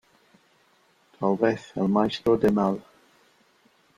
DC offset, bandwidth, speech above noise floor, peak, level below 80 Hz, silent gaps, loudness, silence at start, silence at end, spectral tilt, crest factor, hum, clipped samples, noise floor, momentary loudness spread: under 0.1%; 12 kHz; 40 dB; -8 dBFS; -58 dBFS; none; -24 LUFS; 1.2 s; 1.15 s; -7.5 dB/octave; 18 dB; none; under 0.1%; -63 dBFS; 7 LU